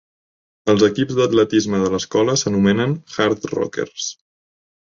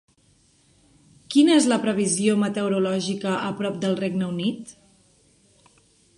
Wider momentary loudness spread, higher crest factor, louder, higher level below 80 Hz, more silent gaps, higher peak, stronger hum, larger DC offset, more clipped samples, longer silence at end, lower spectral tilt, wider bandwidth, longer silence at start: about the same, 9 LU vs 10 LU; about the same, 16 dB vs 18 dB; first, -18 LUFS vs -22 LUFS; first, -52 dBFS vs -66 dBFS; neither; first, -2 dBFS vs -6 dBFS; neither; neither; neither; second, 0.85 s vs 1.45 s; about the same, -5 dB/octave vs -4.5 dB/octave; second, 7.6 kHz vs 11.5 kHz; second, 0.65 s vs 1.3 s